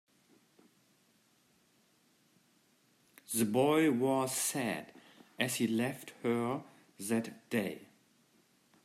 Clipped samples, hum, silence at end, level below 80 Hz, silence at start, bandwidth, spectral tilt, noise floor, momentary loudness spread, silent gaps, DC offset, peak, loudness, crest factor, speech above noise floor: under 0.1%; none; 1 s; -82 dBFS; 3.3 s; 15.5 kHz; -4 dB/octave; -71 dBFS; 13 LU; none; under 0.1%; -16 dBFS; -34 LUFS; 22 dB; 38 dB